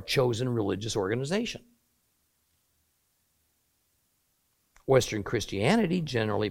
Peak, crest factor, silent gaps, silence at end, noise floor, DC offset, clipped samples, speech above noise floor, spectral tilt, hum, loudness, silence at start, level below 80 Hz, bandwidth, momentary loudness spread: -10 dBFS; 20 dB; none; 0 s; -73 dBFS; under 0.1%; under 0.1%; 46 dB; -5.5 dB/octave; none; -28 LUFS; 0 s; -56 dBFS; 16.5 kHz; 7 LU